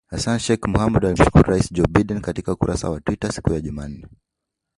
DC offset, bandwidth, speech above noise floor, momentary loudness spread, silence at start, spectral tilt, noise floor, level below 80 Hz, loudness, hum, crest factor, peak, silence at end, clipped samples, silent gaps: under 0.1%; 11.5 kHz; 63 dB; 12 LU; 0.1 s; -6.5 dB/octave; -82 dBFS; -32 dBFS; -20 LUFS; none; 20 dB; 0 dBFS; 0.7 s; under 0.1%; none